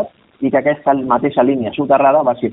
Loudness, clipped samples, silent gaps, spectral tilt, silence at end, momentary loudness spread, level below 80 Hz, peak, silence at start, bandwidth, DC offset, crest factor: -15 LUFS; under 0.1%; none; -5.5 dB/octave; 0 s; 7 LU; -54 dBFS; 0 dBFS; 0 s; 4 kHz; under 0.1%; 14 dB